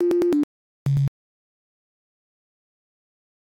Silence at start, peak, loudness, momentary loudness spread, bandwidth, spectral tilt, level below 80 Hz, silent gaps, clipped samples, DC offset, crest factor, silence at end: 0 s; -14 dBFS; -24 LUFS; 10 LU; 16 kHz; -9.5 dB/octave; -54 dBFS; 0.44-0.86 s; under 0.1%; under 0.1%; 12 dB; 2.35 s